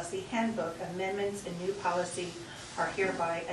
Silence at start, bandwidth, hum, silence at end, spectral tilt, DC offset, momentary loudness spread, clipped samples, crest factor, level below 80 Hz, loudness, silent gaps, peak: 0 s; 12 kHz; none; 0 s; -4.5 dB/octave; under 0.1%; 7 LU; under 0.1%; 16 dB; -64 dBFS; -34 LUFS; none; -18 dBFS